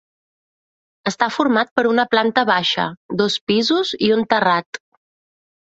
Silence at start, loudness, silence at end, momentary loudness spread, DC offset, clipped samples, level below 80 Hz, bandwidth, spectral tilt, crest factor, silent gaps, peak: 1.05 s; -18 LUFS; 0.85 s; 7 LU; under 0.1%; under 0.1%; -62 dBFS; 8 kHz; -4.5 dB/octave; 18 dB; 1.71-1.76 s, 2.97-3.09 s, 3.41-3.47 s, 4.66-4.73 s; -2 dBFS